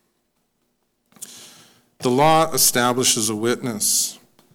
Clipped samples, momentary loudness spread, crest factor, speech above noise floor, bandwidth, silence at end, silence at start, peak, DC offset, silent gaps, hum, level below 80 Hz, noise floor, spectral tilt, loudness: under 0.1%; 22 LU; 16 dB; 52 dB; 19 kHz; 0.4 s; 1.2 s; -6 dBFS; under 0.1%; none; none; -60 dBFS; -70 dBFS; -2.5 dB/octave; -18 LUFS